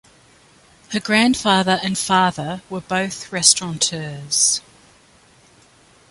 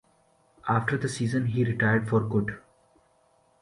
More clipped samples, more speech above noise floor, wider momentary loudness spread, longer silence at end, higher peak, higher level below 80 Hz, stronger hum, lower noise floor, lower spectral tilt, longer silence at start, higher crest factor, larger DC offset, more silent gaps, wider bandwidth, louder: neither; second, 33 dB vs 39 dB; first, 13 LU vs 10 LU; first, 1.5 s vs 1 s; first, 0 dBFS vs -12 dBFS; about the same, -56 dBFS vs -56 dBFS; neither; second, -52 dBFS vs -65 dBFS; second, -2.5 dB/octave vs -7 dB/octave; first, 0.9 s vs 0.65 s; about the same, 22 dB vs 18 dB; neither; neither; about the same, 11.5 kHz vs 11.5 kHz; first, -18 LUFS vs -27 LUFS